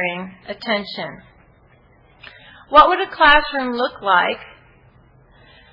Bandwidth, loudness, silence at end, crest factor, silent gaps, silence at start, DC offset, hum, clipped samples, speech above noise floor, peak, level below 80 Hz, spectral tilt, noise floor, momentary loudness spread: 6 kHz; -16 LUFS; 1.25 s; 20 dB; none; 0 s; under 0.1%; none; under 0.1%; 35 dB; 0 dBFS; -44 dBFS; -5.5 dB/octave; -52 dBFS; 18 LU